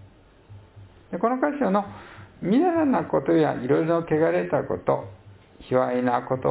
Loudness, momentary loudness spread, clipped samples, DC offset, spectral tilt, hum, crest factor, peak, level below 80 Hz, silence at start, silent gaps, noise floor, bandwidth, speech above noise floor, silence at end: -23 LUFS; 8 LU; under 0.1%; under 0.1%; -11.5 dB/octave; none; 18 dB; -8 dBFS; -56 dBFS; 0.5 s; none; -51 dBFS; 4 kHz; 29 dB; 0 s